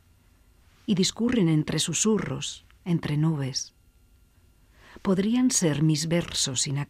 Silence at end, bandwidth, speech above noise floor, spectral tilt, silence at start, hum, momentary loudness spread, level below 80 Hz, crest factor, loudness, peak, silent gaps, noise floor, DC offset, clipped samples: 0.05 s; 15.5 kHz; 34 dB; -4.5 dB/octave; 0.9 s; none; 10 LU; -56 dBFS; 16 dB; -25 LUFS; -10 dBFS; none; -59 dBFS; under 0.1%; under 0.1%